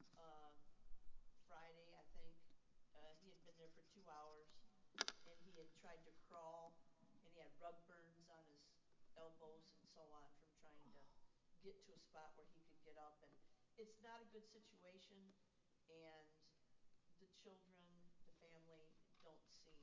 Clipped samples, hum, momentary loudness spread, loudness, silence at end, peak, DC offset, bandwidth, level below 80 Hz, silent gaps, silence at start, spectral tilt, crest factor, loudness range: under 0.1%; none; 9 LU; -62 LUFS; 0 s; -24 dBFS; under 0.1%; 7.2 kHz; -80 dBFS; none; 0 s; -1.5 dB/octave; 38 dB; 12 LU